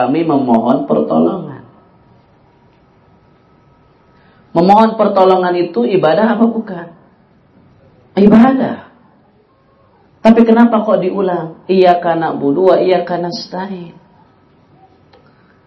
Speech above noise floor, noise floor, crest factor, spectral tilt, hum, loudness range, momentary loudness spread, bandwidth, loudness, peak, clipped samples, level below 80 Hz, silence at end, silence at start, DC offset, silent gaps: 40 dB; -51 dBFS; 14 dB; -8 dB/octave; none; 6 LU; 14 LU; 6.2 kHz; -12 LUFS; 0 dBFS; 0.4%; -52 dBFS; 1.75 s; 0 s; under 0.1%; none